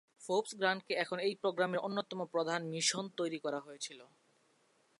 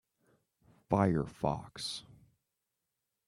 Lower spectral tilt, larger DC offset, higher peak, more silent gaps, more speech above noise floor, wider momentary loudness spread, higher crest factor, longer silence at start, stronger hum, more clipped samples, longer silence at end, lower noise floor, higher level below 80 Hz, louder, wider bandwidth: second, -3 dB/octave vs -6 dB/octave; neither; second, -18 dBFS vs -14 dBFS; neither; second, 36 dB vs 54 dB; about the same, 9 LU vs 10 LU; about the same, 20 dB vs 24 dB; second, 0.2 s vs 0.9 s; neither; neither; second, 0.95 s vs 1.25 s; second, -73 dBFS vs -87 dBFS; second, under -90 dBFS vs -60 dBFS; about the same, -36 LUFS vs -34 LUFS; second, 11.5 kHz vs 13 kHz